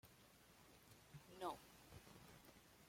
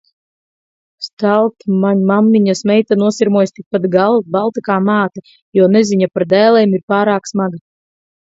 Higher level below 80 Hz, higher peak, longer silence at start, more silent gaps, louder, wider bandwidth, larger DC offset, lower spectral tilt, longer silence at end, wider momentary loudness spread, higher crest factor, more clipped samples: second, -78 dBFS vs -60 dBFS; second, -36 dBFS vs 0 dBFS; second, 0.05 s vs 1 s; second, none vs 1.13-1.17 s, 3.66-3.71 s, 5.42-5.52 s, 6.83-6.88 s; second, -59 LUFS vs -13 LUFS; first, 16.5 kHz vs 7.8 kHz; neither; second, -4.5 dB/octave vs -6.5 dB/octave; second, 0 s vs 0.8 s; first, 16 LU vs 8 LU; first, 24 dB vs 14 dB; neither